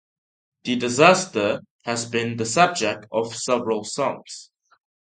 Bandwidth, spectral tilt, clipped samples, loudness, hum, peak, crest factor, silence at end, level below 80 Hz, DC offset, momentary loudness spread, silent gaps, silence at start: 9.6 kHz; -3.5 dB/octave; under 0.1%; -21 LUFS; none; 0 dBFS; 22 dB; 0.65 s; -66 dBFS; under 0.1%; 14 LU; 1.71-1.79 s; 0.65 s